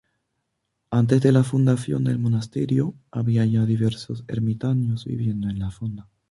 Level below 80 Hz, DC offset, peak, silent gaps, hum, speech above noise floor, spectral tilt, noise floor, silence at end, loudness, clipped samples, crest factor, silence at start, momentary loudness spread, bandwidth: -50 dBFS; under 0.1%; -4 dBFS; none; none; 55 dB; -8.5 dB/octave; -77 dBFS; 0.3 s; -23 LUFS; under 0.1%; 18 dB; 0.9 s; 11 LU; 11.5 kHz